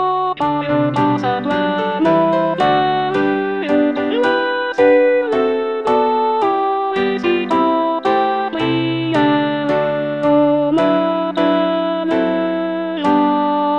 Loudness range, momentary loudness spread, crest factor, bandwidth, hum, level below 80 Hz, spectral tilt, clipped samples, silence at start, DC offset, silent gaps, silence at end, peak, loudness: 1 LU; 4 LU; 14 dB; 8.8 kHz; none; -54 dBFS; -7 dB/octave; under 0.1%; 0 s; 0.2%; none; 0 s; -2 dBFS; -16 LUFS